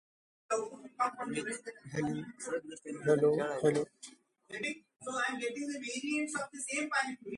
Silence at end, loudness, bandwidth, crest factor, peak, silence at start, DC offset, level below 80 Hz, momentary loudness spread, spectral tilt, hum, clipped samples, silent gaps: 0 s; -35 LUFS; 11.5 kHz; 20 dB; -16 dBFS; 0.5 s; under 0.1%; -74 dBFS; 13 LU; -4.5 dB/octave; none; under 0.1%; none